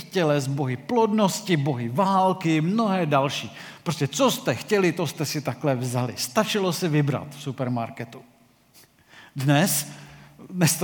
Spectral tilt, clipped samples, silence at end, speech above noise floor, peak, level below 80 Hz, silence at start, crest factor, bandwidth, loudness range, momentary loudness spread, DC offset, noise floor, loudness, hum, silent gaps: -5 dB/octave; under 0.1%; 0 s; 32 dB; -4 dBFS; -70 dBFS; 0 s; 20 dB; 19 kHz; 5 LU; 12 LU; under 0.1%; -56 dBFS; -24 LUFS; none; none